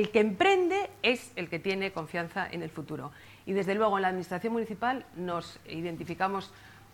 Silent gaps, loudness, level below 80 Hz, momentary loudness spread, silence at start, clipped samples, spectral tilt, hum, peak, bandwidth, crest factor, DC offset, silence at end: none; -31 LUFS; -64 dBFS; 14 LU; 0 s; under 0.1%; -5.5 dB/octave; none; -10 dBFS; 18 kHz; 20 dB; under 0.1%; 0.1 s